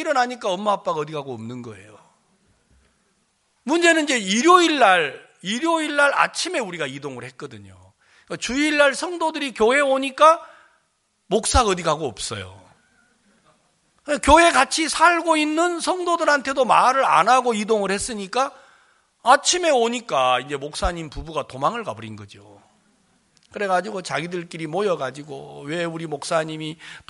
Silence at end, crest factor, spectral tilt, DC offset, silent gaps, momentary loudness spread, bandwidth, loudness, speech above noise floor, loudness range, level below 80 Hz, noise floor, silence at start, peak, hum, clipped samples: 0.1 s; 20 dB; -3 dB/octave; under 0.1%; none; 18 LU; 11.5 kHz; -20 LUFS; 48 dB; 10 LU; -42 dBFS; -68 dBFS; 0 s; 0 dBFS; none; under 0.1%